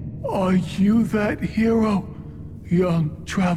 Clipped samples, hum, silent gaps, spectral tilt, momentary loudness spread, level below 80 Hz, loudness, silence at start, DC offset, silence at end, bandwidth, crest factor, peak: under 0.1%; none; none; -7.5 dB/octave; 16 LU; -44 dBFS; -21 LUFS; 0 s; under 0.1%; 0 s; 13 kHz; 12 dB; -10 dBFS